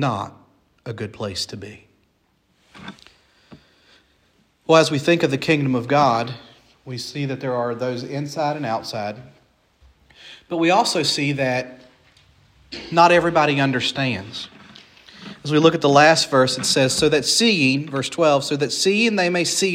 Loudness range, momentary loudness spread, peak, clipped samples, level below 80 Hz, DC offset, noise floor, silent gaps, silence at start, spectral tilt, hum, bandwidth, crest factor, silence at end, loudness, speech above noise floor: 11 LU; 21 LU; 0 dBFS; under 0.1%; -58 dBFS; under 0.1%; -64 dBFS; none; 0 s; -4 dB/octave; none; 16 kHz; 20 dB; 0 s; -19 LUFS; 45 dB